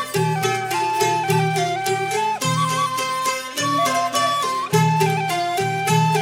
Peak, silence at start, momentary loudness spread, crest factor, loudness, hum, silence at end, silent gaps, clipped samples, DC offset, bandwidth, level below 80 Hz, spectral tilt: -4 dBFS; 0 s; 3 LU; 16 dB; -20 LUFS; none; 0 s; none; under 0.1%; under 0.1%; 17 kHz; -60 dBFS; -4 dB/octave